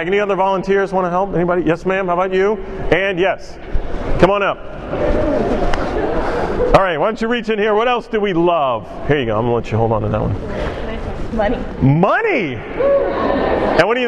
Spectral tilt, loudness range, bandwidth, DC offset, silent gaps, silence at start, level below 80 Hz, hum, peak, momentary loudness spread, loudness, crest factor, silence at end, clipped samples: -7 dB/octave; 2 LU; 10 kHz; under 0.1%; none; 0 s; -28 dBFS; none; 0 dBFS; 10 LU; -17 LUFS; 16 dB; 0 s; under 0.1%